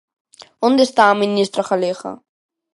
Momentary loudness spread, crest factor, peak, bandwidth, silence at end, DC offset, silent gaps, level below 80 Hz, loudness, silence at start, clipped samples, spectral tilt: 12 LU; 18 dB; 0 dBFS; 11.5 kHz; 0.6 s; under 0.1%; none; -68 dBFS; -16 LUFS; 0.6 s; under 0.1%; -4.5 dB/octave